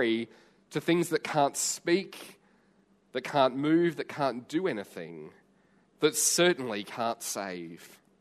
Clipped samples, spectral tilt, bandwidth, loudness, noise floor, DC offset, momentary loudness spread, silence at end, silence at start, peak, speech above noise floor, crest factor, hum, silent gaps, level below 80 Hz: under 0.1%; -3.5 dB/octave; 14 kHz; -29 LUFS; -66 dBFS; under 0.1%; 18 LU; 0.35 s; 0 s; -10 dBFS; 36 dB; 20 dB; none; none; -78 dBFS